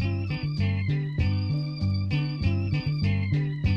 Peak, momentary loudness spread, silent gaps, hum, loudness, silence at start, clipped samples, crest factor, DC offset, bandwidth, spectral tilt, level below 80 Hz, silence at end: -14 dBFS; 2 LU; none; none; -27 LUFS; 0 s; under 0.1%; 12 dB; under 0.1%; 6 kHz; -8.5 dB/octave; -40 dBFS; 0 s